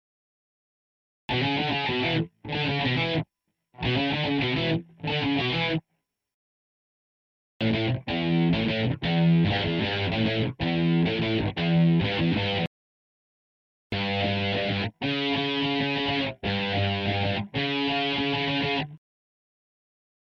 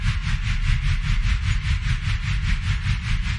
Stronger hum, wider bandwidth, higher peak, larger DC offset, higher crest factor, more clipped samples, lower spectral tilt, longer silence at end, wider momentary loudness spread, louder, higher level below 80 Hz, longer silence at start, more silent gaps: neither; second, 6.4 kHz vs 10.5 kHz; second, -14 dBFS vs -8 dBFS; neither; about the same, 14 dB vs 14 dB; neither; first, -7.5 dB/octave vs -4.5 dB/octave; first, 1.3 s vs 0 s; first, 6 LU vs 1 LU; about the same, -26 LUFS vs -25 LUFS; second, -52 dBFS vs -24 dBFS; first, 1.3 s vs 0 s; first, 6.34-7.60 s, 12.67-13.90 s vs none